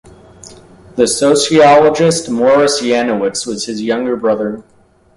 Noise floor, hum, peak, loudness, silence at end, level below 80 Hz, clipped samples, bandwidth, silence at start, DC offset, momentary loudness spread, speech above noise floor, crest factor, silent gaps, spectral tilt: -38 dBFS; none; 0 dBFS; -12 LUFS; 0.55 s; -50 dBFS; under 0.1%; 11.5 kHz; 0.45 s; under 0.1%; 12 LU; 27 dB; 14 dB; none; -4 dB/octave